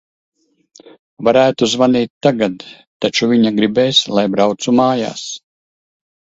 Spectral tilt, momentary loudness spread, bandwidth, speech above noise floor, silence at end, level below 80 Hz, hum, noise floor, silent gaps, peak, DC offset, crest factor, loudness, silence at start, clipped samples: -4.5 dB/octave; 10 LU; 8 kHz; over 76 dB; 1 s; -56 dBFS; none; under -90 dBFS; 0.99-1.17 s, 2.10-2.21 s, 2.87-3.00 s; 0 dBFS; under 0.1%; 16 dB; -14 LUFS; 0.85 s; under 0.1%